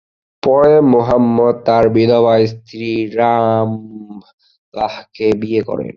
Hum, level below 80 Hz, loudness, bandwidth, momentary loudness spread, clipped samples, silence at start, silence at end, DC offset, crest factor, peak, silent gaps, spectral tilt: none; -48 dBFS; -14 LUFS; 6.8 kHz; 12 LU; under 0.1%; 0.45 s; 0.05 s; under 0.1%; 12 dB; 0 dBFS; 4.33-4.38 s, 4.58-4.72 s; -8.5 dB/octave